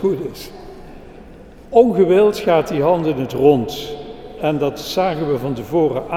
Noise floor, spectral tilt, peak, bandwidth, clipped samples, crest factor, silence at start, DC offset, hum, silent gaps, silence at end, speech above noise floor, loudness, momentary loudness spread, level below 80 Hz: -39 dBFS; -6.5 dB/octave; 0 dBFS; 16 kHz; under 0.1%; 18 dB; 0 s; under 0.1%; none; none; 0 s; 23 dB; -17 LUFS; 19 LU; -44 dBFS